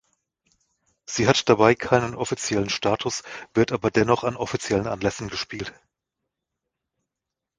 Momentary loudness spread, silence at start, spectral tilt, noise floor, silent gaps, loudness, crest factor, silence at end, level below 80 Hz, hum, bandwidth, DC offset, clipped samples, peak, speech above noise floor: 12 LU; 1.1 s; -4.5 dB/octave; -86 dBFS; none; -23 LUFS; 24 dB; 1.85 s; -52 dBFS; none; 10 kHz; under 0.1%; under 0.1%; -2 dBFS; 63 dB